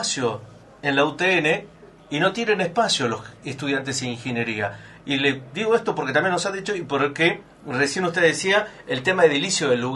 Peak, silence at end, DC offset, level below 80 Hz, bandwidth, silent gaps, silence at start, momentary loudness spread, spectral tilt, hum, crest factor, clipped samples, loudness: -2 dBFS; 0 s; under 0.1%; -60 dBFS; 11.5 kHz; none; 0 s; 10 LU; -3.5 dB/octave; none; 20 dB; under 0.1%; -22 LUFS